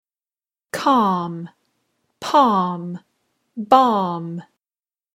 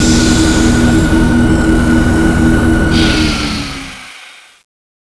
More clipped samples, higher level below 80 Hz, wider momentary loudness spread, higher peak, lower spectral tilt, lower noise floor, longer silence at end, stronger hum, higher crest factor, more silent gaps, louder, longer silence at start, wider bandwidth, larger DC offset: neither; second, -66 dBFS vs -18 dBFS; first, 20 LU vs 12 LU; about the same, 0 dBFS vs 0 dBFS; about the same, -6 dB/octave vs -5 dB/octave; first, under -90 dBFS vs -36 dBFS; about the same, 0.75 s vs 0.8 s; neither; first, 20 dB vs 10 dB; neither; second, -18 LUFS vs -11 LUFS; first, 0.75 s vs 0 s; first, 16 kHz vs 11 kHz; neither